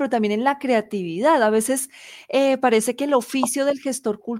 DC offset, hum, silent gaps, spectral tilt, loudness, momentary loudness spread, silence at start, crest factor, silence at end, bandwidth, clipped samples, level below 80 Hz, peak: under 0.1%; none; none; -3.5 dB/octave; -21 LUFS; 8 LU; 0 s; 16 dB; 0 s; 16.5 kHz; under 0.1%; -68 dBFS; -6 dBFS